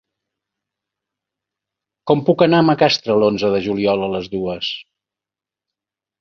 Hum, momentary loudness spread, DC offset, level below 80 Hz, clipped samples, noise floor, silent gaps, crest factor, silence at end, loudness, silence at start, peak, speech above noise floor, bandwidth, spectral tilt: none; 11 LU; under 0.1%; -54 dBFS; under 0.1%; -89 dBFS; none; 18 dB; 1.4 s; -17 LUFS; 2.05 s; -2 dBFS; 72 dB; 7 kHz; -6.5 dB/octave